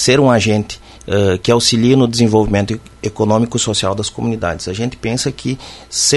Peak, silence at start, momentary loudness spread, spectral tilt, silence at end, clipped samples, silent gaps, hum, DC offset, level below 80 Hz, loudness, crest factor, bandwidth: 0 dBFS; 0 s; 12 LU; -4.5 dB/octave; 0 s; under 0.1%; none; none; under 0.1%; -38 dBFS; -15 LUFS; 14 dB; 12 kHz